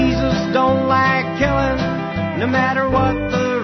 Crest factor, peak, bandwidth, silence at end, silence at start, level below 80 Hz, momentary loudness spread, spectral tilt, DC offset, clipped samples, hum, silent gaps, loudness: 14 dB; -4 dBFS; 6.4 kHz; 0 s; 0 s; -32 dBFS; 6 LU; -6.5 dB/octave; under 0.1%; under 0.1%; none; none; -17 LUFS